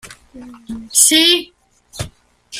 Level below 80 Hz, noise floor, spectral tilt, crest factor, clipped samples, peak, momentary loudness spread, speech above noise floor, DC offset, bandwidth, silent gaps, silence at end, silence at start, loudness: -48 dBFS; -40 dBFS; -0.5 dB/octave; 18 dB; under 0.1%; 0 dBFS; 23 LU; 25 dB; under 0.1%; 16 kHz; none; 0 s; 0.05 s; -11 LUFS